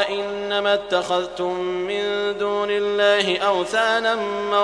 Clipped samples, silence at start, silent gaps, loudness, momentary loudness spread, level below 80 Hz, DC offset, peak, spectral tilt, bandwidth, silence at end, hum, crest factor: under 0.1%; 0 s; none; -21 LUFS; 6 LU; -58 dBFS; under 0.1%; -4 dBFS; -3.5 dB/octave; 10.5 kHz; 0 s; none; 18 dB